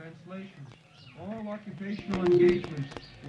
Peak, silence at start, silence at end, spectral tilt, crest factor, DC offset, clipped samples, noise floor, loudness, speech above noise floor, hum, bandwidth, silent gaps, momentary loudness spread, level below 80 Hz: -12 dBFS; 0 s; 0 s; -8 dB/octave; 18 dB; under 0.1%; under 0.1%; -52 dBFS; -29 LUFS; 24 dB; none; 7.4 kHz; none; 23 LU; -56 dBFS